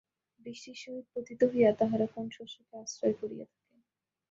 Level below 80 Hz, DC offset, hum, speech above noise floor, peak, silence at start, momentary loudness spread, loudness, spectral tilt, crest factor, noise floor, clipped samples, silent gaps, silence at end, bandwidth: -74 dBFS; under 0.1%; none; 51 dB; -12 dBFS; 0.45 s; 21 LU; -31 LUFS; -5.5 dB/octave; 20 dB; -83 dBFS; under 0.1%; none; 0.85 s; 7.8 kHz